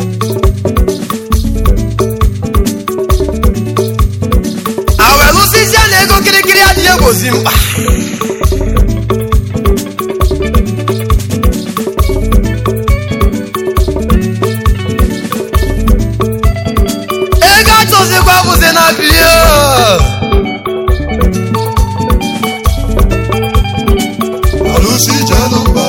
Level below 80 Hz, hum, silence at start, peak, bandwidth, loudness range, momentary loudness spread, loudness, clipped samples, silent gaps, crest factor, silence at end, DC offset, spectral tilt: -14 dBFS; none; 0 s; 0 dBFS; 17.5 kHz; 7 LU; 9 LU; -9 LUFS; 0.7%; none; 8 dB; 0 s; 0.3%; -4 dB/octave